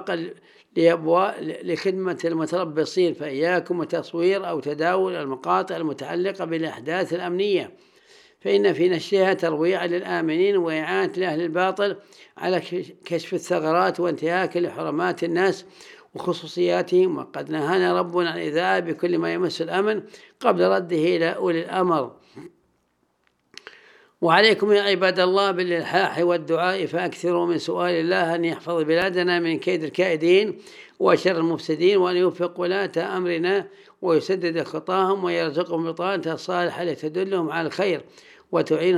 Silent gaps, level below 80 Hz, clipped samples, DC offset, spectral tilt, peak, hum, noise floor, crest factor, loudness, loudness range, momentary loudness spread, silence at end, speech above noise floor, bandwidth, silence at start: none; -76 dBFS; under 0.1%; under 0.1%; -5.5 dB/octave; -2 dBFS; none; -69 dBFS; 22 dB; -23 LUFS; 4 LU; 8 LU; 0 s; 46 dB; 12 kHz; 0 s